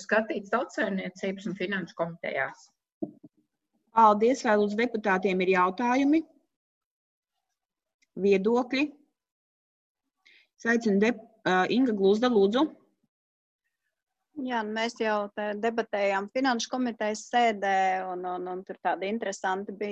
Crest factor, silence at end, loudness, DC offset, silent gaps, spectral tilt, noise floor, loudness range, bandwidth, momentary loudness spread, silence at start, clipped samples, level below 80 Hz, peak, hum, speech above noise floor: 20 dB; 0 s; -27 LUFS; under 0.1%; 2.92-3.01 s, 6.56-7.22 s, 7.94-7.99 s, 9.32-9.95 s, 13.09-13.59 s; -5 dB/octave; -87 dBFS; 6 LU; 8.4 kHz; 10 LU; 0 s; under 0.1%; -72 dBFS; -8 dBFS; none; 60 dB